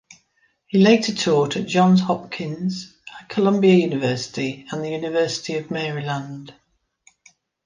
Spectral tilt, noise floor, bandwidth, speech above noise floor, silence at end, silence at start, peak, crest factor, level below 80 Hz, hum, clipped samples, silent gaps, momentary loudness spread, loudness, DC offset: -6 dB/octave; -65 dBFS; 9.6 kHz; 45 dB; 1.15 s; 0.75 s; -2 dBFS; 18 dB; -64 dBFS; none; under 0.1%; none; 14 LU; -20 LUFS; under 0.1%